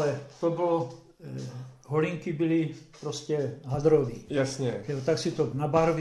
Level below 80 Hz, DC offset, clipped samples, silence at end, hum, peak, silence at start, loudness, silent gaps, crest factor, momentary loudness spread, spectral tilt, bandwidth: -56 dBFS; under 0.1%; under 0.1%; 0 s; none; -10 dBFS; 0 s; -29 LUFS; none; 18 dB; 14 LU; -6.5 dB/octave; 12 kHz